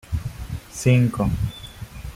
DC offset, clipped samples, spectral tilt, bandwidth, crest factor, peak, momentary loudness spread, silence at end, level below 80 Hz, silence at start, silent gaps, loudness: under 0.1%; under 0.1%; -6.5 dB/octave; 15.5 kHz; 18 dB; -6 dBFS; 19 LU; 0 s; -36 dBFS; 0.1 s; none; -23 LUFS